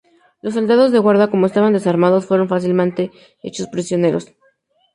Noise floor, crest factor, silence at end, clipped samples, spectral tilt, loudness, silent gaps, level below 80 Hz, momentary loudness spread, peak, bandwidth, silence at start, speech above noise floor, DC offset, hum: -59 dBFS; 14 dB; 0.7 s; under 0.1%; -7 dB/octave; -16 LUFS; none; -62 dBFS; 13 LU; -2 dBFS; 11 kHz; 0.45 s; 44 dB; under 0.1%; none